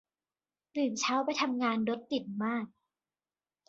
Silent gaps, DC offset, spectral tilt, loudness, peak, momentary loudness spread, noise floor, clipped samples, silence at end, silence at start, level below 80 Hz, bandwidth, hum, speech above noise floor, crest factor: none; under 0.1%; -3.5 dB/octave; -32 LUFS; -18 dBFS; 7 LU; under -90 dBFS; under 0.1%; 1 s; 0.75 s; -78 dBFS; 8 kHz; none; over 58 dB; 16 dB